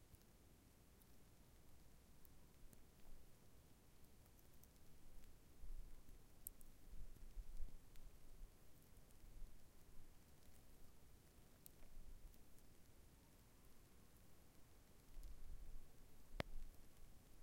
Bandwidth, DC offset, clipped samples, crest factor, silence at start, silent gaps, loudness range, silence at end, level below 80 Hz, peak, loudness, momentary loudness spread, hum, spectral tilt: 16 kHz; under 0.1%; under 0.1%; 32 dB; 0 s; none; 8 LU; 0 s; -60 dBFS; -24 dBFS; -64 LUFS; 11 LU; none; -4 dB/octave